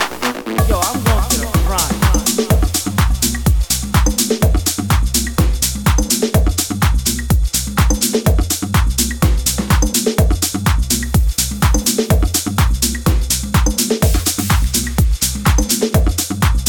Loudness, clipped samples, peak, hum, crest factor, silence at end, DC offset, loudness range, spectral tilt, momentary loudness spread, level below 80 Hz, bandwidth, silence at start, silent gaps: -15 LUFS; under 0.1%; 0 dBFS; none; 14 dB; 0 s; 0.2%; 0 LU; -4 dB/octave; 2 LU; -18 dBFS; 19.5 kHz; 0 s; none